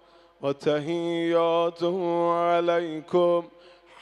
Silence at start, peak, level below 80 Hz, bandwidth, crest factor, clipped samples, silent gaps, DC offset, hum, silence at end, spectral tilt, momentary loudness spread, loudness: 0.4 s; -10 dBFS; -74 dBFS; 10 kHz; 16 dB; under 0.1%; none; under 0.1%; none; 0.5 s; -6.5 dB/octave; 5 LU; -25 LUFS